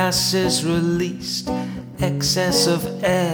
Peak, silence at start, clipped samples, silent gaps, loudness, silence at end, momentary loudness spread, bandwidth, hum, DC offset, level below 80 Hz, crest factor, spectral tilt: -4 dBFS; 0 s; under 0.1%; none; -20 LUFS; 0 s; 8 LU; over 20 kHz; none; under 0.1%; -44 dBFS; 16 dB; -4 dB/octave